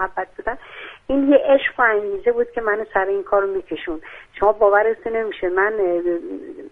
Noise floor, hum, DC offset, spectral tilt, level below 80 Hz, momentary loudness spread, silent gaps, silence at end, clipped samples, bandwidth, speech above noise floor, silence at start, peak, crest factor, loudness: -39 dBFS; none; under 0.1%; -7 dB/octave; -48 dBFS; 16 LU; none; 0.05 s; under 0.1%; 3.9 kHz; 19 dB; 0 s; -2 dBFS; 18 dB; -19 LUFS